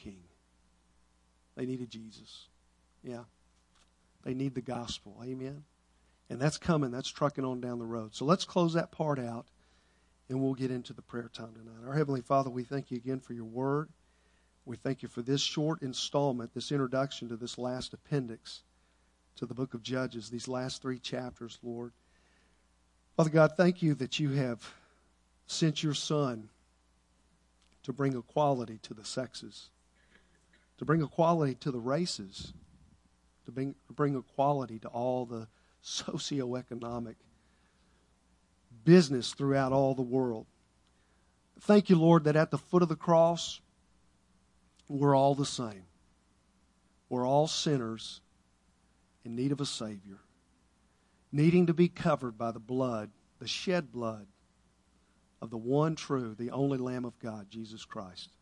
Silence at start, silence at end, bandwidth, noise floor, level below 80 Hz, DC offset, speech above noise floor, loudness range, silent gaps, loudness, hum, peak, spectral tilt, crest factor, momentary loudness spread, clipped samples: 0.05 s; 0.15 s; 11 kHz; -69 dBFS; -68 dBFS; under 0.1%; 38 dB; 10 LU; none; -32 LUFS; none; -10 dBFS; -6 dB/octave; 24 dB; 20 LU; under 0.1%